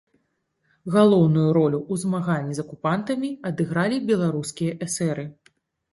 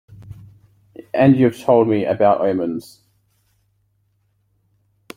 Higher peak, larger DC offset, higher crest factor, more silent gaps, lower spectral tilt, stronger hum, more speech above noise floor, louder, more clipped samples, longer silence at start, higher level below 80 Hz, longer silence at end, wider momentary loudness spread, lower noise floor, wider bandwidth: second, -6 dBFS vs -2 dBFS; neither; about the same, 18 dB vs 18 dB; neither; second, -6.5 dB/octave vs -8.5 dB/octave; neither; about the same, 51 dB vs 49 dB; second, -23 LUFS vs -16 LUFS; neither; first, 0.85 s vs 0.1 s; about the same, -62 dBFS vs -58 dBFS; second, 0.6 s vs 2.35 s; about the same, 11 LU vs 13 LU; first, -72 dBFS vs -65 dBFS; second, 11.5 kHz vs 15.5 kHz